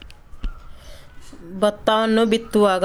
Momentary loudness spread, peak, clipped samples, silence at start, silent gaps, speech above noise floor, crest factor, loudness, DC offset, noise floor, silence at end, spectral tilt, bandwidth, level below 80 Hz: 19 LU; -4 dBFS; under 0.1%; 0.05 s; none; 20 dB; 16 dB; -19 LUFS; under 0.1%; -39 dBFS; 0 s; -5 dB/octave; 14 kHz; -38 dBFS